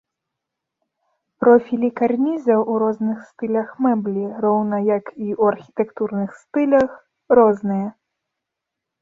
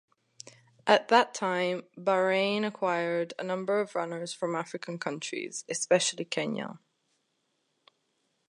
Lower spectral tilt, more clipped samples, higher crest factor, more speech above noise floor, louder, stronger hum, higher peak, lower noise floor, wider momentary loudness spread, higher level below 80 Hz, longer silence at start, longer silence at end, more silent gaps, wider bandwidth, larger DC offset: first, -9.5 dB/octave vs -3.5 dB/octave; neither; second, 18 dB vs 24 dB; first, 64 dB vs 48 dB; first, -19 LUFS vs -29 LUFS; neither; first, -2 dBFS vs -6 dBFS; first, -82 dBFS vs -77 dBFS; about the same, 10 LU vs 12 LU; first, -62 dBFS vs -84 dBFS; first, 1.4 s vs 0.85 s; second, 1.1 s vs 1.7 s; neither; second, 7.2 kHz vs 11.5 kHz; neither